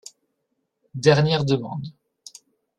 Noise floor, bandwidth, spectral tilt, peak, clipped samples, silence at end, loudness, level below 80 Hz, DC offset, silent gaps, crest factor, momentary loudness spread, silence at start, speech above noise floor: -76 dBFS; 11 kHz; -6 dB/octave; -2 dBFS; under 0.1%; 0.9 s; -21 LUFS; -58 dBFS; under 0.1%; none; 22 dB; 20 LU; 0.95 s; 55 dB